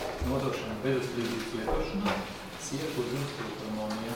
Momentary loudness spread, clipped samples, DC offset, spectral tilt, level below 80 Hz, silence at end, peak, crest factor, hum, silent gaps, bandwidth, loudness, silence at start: 5 LU; under 0.1%; under 0.1%; -5 dB/octave; -44 dBFS; 0 s; -18 dBFS; 16 dB; none; none; 18 kHz; -33 LUFS; 0 s